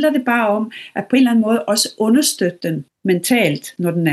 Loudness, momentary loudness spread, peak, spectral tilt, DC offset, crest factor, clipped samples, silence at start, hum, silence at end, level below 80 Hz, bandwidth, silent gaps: -17 LUFS; 10 LU; -2 dBFS; -4.5 dB/octave; under 0.1%; 14 dB; under 0.1%; 0 s; none; 0 s; -70 dBFS; 13 kHz; none